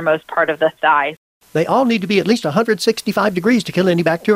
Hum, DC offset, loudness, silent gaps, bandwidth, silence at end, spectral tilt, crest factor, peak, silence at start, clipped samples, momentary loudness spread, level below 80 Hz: none; under 0.1%; -16 LUFS; 1.17-1.41 s; 15.5 kHz; 0 s; -5.5 dB/octave; 14 dB; -2 dBFS; 0 s; under 0.1%; 3 LU; -58 dBFS